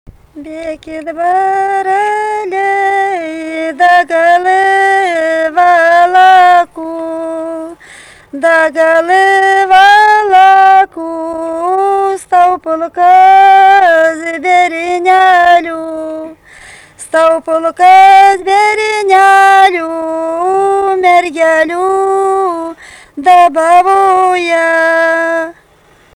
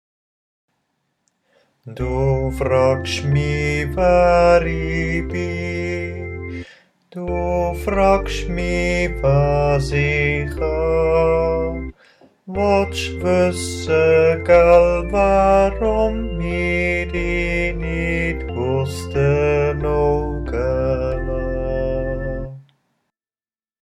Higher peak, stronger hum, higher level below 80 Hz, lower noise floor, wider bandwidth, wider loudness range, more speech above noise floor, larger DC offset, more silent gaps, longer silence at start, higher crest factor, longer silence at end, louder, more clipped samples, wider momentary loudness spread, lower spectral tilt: about the same, 0 dBFS vs 0 dBFS; neither; second, -50 dBFS vs -28 dBFS; second, -45 dBFS vs under -90 dBFS; second, 12 kHz vs 13.5 kHz; second, 4 LU vs 7 LU; second, 37 dB vs over 73 dB; neither; neither; second, 0.35 s vs 1.85 s; second, 8 dB vs 18 dB; second, 0.65 s vs 1.2 s; first, -8 LUFS vs -18 LUFS; first, 0.2% vs under 0.1%; first, 15 LU vs 11 LU; second, -2.5 dB/octave vs -6.5 dB/octave